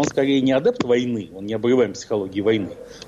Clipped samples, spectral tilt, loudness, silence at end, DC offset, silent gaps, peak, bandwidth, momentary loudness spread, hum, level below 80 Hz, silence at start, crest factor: under 0.1%; -5.5 dB/octave; -21 LUFS; 0 s; under 0.1%; none; -8 dBFS; 8.2 kHz; 9 LU; none; -56 dBFS; 0 s; 12 dB